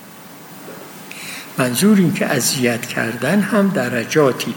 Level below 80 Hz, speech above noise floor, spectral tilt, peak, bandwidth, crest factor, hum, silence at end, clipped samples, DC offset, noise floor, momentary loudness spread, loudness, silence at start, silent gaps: -64 dBFS; 22 dB; -4.5 dB/octave; -2 dBFS; 17 kHz; 16 dB; none; 0 s; under 0.1%; under 0.1%; -38 dBFS; 21 LU; -17 LUFS; 0 s; none